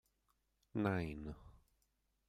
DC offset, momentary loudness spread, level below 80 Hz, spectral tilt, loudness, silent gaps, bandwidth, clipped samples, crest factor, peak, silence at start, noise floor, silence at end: under 0.1%; 14 LU; -62 dBFS; -8.5 dB/octave; -42 LUFS; none; 15.5 kHz; under 0.1%; 24 dB; -22 dBFS; 0.75 s; -82 dBFS; 0.75 s